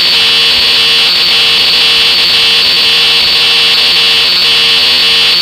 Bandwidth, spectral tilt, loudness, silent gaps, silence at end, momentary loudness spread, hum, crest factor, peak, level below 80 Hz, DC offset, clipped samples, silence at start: 17 kHz; 0 dB/octave; -4 LUFS; none; 0 s; 0 LU; none; 8 dB; 0 dBFS; -42 dBFS; under 0.1%; under 0.1%; 0 s